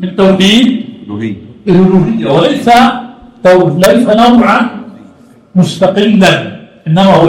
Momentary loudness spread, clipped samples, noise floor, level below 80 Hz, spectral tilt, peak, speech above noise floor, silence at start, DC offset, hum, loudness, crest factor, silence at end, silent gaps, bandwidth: 14 LU; 0.7%; -38 dBFS; -40 dBFS; -6 dB/octave; 0 dBFS; 32 dB; 0 s; under 0.1%; none; -8 LUFS; 8 dB; 0 s; none; 17 kHz